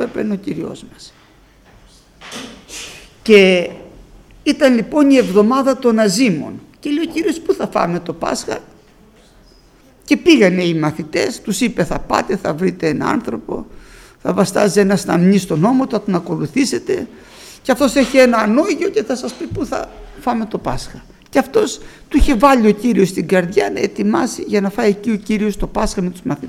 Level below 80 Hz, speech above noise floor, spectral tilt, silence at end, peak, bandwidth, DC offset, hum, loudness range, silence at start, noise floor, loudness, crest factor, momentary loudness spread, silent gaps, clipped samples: -34 dBFS; 32 dB; -5.5 dB/octave; 0 s; 0 dBFS; 16 kHz; under 0.1%; none; 5 LU; 0 s; -48 dBFS; -16 LUFS; 16 dB; 16 LU; none; under 0.1%